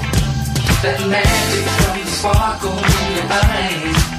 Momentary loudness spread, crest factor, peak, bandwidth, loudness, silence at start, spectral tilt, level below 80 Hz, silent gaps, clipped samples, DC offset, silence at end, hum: 4 LU; 14 dB; -2 dBFS; 15.5 kHz; -16 LUFS; 0 s; -4 dB/octave; -24 dBFS; none; under 0.1%; under 0.1%; 0 s; none